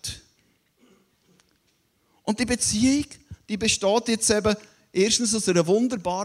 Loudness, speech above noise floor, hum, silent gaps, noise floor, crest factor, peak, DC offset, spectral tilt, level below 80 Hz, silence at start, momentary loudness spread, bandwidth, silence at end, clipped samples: -23 LUFS; 45 dB; none; none; -68 dBFS; 20 dB; -6 dBFS; under 0.1%; -3.5 dB/octave; -50 dBFS; 0.05 s; 13 LU; 15.5 kHz; 0 s; under 0.1%